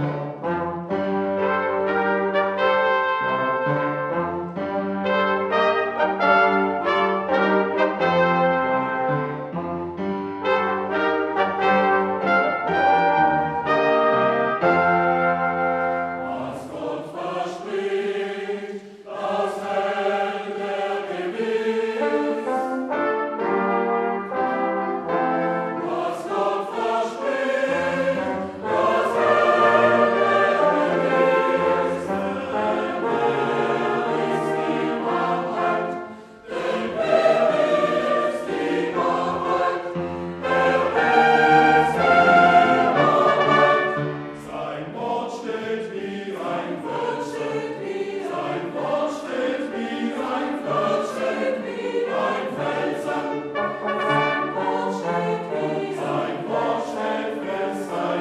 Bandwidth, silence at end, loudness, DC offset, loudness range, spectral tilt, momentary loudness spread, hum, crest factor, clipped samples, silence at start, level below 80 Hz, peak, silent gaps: 12.5 kHz; 0 s; -22 LUFS; under 0.1%; 8 LU; -6 dB/octave; 11 LU; none; 18 dB; under 0.1%; 0 s; -60 dBFS; -4 dBFS; none